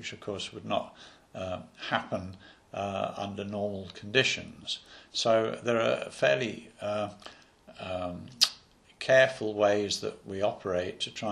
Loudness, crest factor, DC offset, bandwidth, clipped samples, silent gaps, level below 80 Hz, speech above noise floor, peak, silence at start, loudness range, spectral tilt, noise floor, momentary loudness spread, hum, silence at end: -30 LUFS; 30 dB; under 0.1%; 12.5 kHz; under 0.1%; none; -68 dBFS; 25 dB; -2 dBFS; 0 s; 7 LU; -3.5 dB/octave; -56 dBFS; 13 LU; none; 0 s